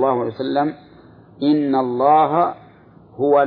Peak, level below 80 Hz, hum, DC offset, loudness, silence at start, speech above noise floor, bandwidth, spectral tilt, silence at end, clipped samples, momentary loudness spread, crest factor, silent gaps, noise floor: -4 dBFS; -62 dBFS; none; under 0.1%; -18 LUFS; 0 s; 30 dB; 4.8 kHz; -10 dB/octave; 0 s; under 0.1%; 9 LU; 16 dB; none; -46 dBFS